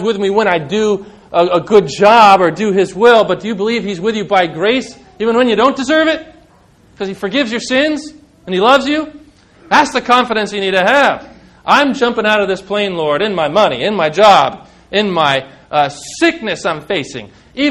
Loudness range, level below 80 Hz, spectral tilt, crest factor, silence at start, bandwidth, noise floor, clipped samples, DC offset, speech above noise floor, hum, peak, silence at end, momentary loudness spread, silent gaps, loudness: 5 LU; -50 dBFS; -4.5 dB/octave; 14 dB; 0 s; 13 kHz; -47 dBFS; 0.5%; under 0.1%; 35 dB; none; 0 dBFS; 0 s; 10 LU; none; -13 LUFS